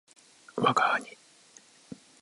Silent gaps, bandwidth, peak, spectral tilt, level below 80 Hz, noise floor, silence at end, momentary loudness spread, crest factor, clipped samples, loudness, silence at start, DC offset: none; 11.5 kHz; -12 dBFS; -4 dB/octave; -80 dBFS; -57 dBFS; 0.25 s; 25 LU; 20 dB; under 0.1%; -27 LUFS; 0.55 s; under 0.1%